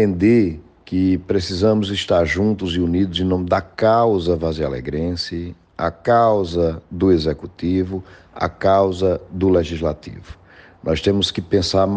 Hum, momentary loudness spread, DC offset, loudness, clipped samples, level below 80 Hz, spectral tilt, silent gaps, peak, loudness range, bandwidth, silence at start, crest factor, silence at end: none; 10 LU; under 0.1%; -19 LUFS; under 0.1%; -40 dBFS; -6.5 dB/octave; none; -4 dBFS; 2 LU; 9.4 kHz; 0 s; 14 dB; 0 s